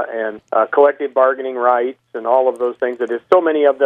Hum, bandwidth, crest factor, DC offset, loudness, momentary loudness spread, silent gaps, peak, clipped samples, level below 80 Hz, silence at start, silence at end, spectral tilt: none; 9.2 kHz; 16 dB; under 0.1%; -16 LUFS; 9 LU; none; 0 dBFS; under 0.1%; -72 dBFS; 0 s; 0 s; -5.5 dB/octave